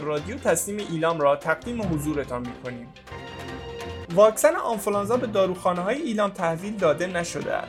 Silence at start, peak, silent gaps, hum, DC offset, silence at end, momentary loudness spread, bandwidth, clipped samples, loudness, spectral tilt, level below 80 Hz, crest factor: 0 s; -4 dBFS; none; none; under 0.1%; 0 s; 15 LU; 16 kHz; under 0.1%; -24 LUFS; -4.5 dB/octave; -50 dBFS; 20 dB